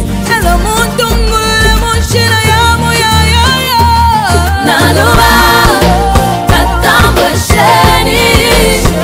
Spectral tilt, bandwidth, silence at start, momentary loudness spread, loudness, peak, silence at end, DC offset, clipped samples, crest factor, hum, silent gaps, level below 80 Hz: -4 dB/octave; 16.5 kHz; 0 s; 5 LU; -7 LUFS; 0 dBFS; 0 s; under 0.1%; 1%; 8 dB; none; none; -16 dBFS